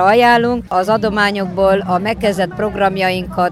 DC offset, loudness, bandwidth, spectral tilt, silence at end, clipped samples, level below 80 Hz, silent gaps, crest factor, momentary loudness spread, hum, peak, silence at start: under 0.1%; -15 LUFS; 14.5 kHz; -5.5 dB/octave; 0 s; under 0.1%; -40 dBFS; none; 12 dB; 7 LU; none; -2 dBFS; 0 s